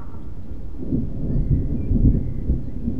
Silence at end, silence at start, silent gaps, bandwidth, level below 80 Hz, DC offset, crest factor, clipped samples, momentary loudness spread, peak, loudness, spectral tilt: 0 s; 0 s; none; 2.5 kHz; -26 dBFS; 5%; 18 dB; under 0.1%; 17 LU; -4 dBFS; -24 LUFS; -12 dB/octave